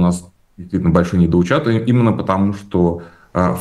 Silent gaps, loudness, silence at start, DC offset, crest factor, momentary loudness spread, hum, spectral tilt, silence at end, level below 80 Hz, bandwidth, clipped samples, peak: none; -16 LUFS; 0 s; under 0.1%; 16 dB; 10 LU; none; -8 dB/octave; 0 s; -38 dBFS; 11 kHz; under 0.1%; 0 dBFS